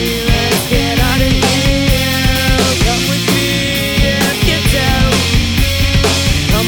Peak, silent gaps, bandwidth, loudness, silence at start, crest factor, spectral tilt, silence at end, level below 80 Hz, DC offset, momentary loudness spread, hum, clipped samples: 0 dBFS; none; over 20 kHz; -12 LUFS; 0 s; 12 dB; -4 dB/octave; 0 s; -18 dBFS; under 0.1%; 2 LU; none; under 0.1%